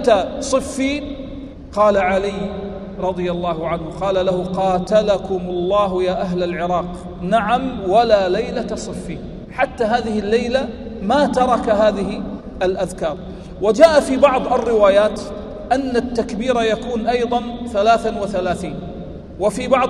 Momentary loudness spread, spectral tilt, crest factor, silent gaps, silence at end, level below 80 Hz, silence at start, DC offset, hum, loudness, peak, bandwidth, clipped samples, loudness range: 14 LU; -5.5 dB/octave; 18 dB; none; 0 s; -38 dBFS; 0 s; under 0.1%; none; -18 LUFS; 0 dBFS; 12 kHz; under 0.1%; 4 LU